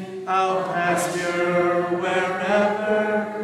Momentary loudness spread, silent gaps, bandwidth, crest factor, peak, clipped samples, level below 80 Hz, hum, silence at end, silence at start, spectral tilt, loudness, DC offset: 3 LU; none; 15 kHz; 14 dB; -8 dBFS; under 0.1%; -70 dBFS; none; 0 s; 0 s; -5 dB/octave; -22 LUFS; under 0.1%